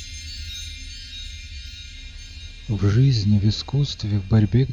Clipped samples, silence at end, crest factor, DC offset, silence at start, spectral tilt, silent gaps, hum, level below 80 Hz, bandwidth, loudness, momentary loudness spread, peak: under 0.1%; 0 s; 14 dB; under 0.1%; 0 s; -6.5 dB/octave; none; none; -38 dBFS; 9.8 kHz; -21 LUFS; 20 LU; -8 dBFS